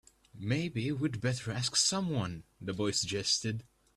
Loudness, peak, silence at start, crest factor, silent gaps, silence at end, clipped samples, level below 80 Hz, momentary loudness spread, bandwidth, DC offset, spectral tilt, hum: -32 LUFS; -14 dBFS; 0.35 s; 20 dB; none; 0.35 s; under 0.1%; -62 dBFS; 13 LU; 13 kHz; under 0.1%; -3.5 dB/octave; none